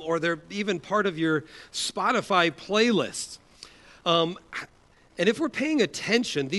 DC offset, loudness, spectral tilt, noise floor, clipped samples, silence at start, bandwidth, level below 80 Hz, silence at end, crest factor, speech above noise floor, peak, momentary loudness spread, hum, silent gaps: under 0.1%; -26 LUFS; -4 dB/octave; -50 dBFS; under 0.1%; 0 s; 11.5 kHz; -64 dBFS; 0 s; 20 dB; 24 dB; -6 dBFS; 14 LU; none; none